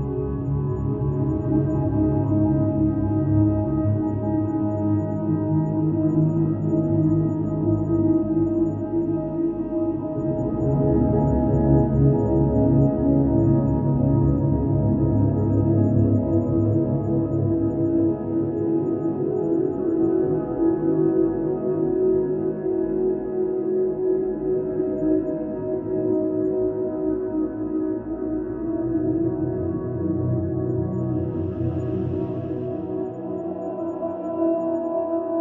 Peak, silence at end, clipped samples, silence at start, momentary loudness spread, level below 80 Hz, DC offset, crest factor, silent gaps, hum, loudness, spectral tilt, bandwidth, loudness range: -6 dBFS; 0 s; under 0.1%; 0 s; 7 LU; -38 dBFS; under 0.1%; 16 dB; none; none; -22 LUFS; -13 dB/octave; 2.9 kHz; 6 LU